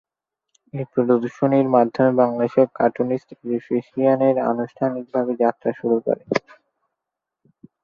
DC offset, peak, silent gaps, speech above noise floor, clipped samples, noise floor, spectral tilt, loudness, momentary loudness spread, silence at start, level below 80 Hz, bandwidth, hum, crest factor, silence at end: under 0.1%; -2 dBFS; none; 64 dB; under 0.1%; -84 dBFS; -8.5 dB/octave; -20 LUFS; 8 LU; 0.75 s; -66 dBFS; 7 kHz; none; 18 dB; 1.45 s